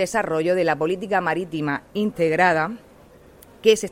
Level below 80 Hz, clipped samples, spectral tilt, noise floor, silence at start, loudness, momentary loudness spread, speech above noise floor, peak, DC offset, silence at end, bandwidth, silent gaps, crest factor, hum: -56 dBFS; under 0.1%; -4.5 dB/octave; -49 dBFS; 0 s; -22 LUFS; 8 LU; 28 dB; -4 dBFS; under 0.1%; 0 s; 16.5 kHz; none; 18 dB; none